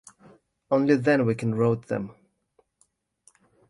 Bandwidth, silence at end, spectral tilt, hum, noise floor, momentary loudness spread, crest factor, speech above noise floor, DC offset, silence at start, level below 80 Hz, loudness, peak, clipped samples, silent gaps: 11.5 kHz; 1.6 s; -8 dB/octave; none; -69 dBFS; 11 LU; 20 dB; 46 dB; under 0.1%; 0.7 s; -64 dBFS; -24 LUFS; -8 dBFS; under 0.1%; none